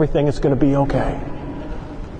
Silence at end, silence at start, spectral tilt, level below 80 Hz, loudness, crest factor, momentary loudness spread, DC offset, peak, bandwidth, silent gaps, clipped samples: 0 s; 0 s; -8.5 dB/octave; -28 dBFS; -19 LUFS; 16 dB; 15 LU; under 0.1%; -2 dBFS; 9.4 kHz; none; under 0.1%